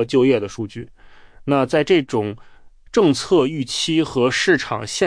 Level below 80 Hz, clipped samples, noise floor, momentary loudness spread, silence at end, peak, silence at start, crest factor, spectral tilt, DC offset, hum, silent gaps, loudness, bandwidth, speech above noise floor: -50 dBFS; under 0.1%; -43 dBFS; 14 LU; 0 s; -4 dBFS; 0 s; 14 dB; -4.5 dB/octave; under 0.1%; none; none; -18 LUFS; 10.5 kHz; 25 dB